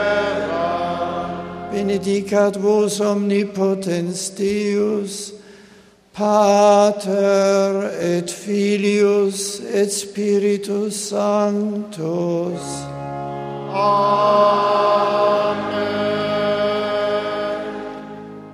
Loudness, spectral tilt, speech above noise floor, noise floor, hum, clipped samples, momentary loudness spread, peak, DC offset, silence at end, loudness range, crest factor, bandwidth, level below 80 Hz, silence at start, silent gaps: -19 LUFS; -5 dB/octave; 31 dB; -48 dBFS; none; under 0.1%; 13 LU; -2 dBFS; under 0.1%; 0 s; 4 LU; 18 dB; 15 kHz; -58 dBFS; 0 s; none